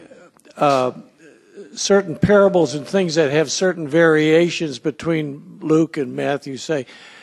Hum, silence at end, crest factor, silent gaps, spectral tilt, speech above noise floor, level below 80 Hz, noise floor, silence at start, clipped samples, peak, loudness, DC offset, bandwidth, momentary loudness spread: none; 0.25 s; 16 dB; none; -5 dB/octave; 28 dB; -54 dBFS; -46 dBFS; 0.55 s; under 0.1%; -2 dBFS; -18 LUFS; under 0.1%; 12 kHz; 11 LU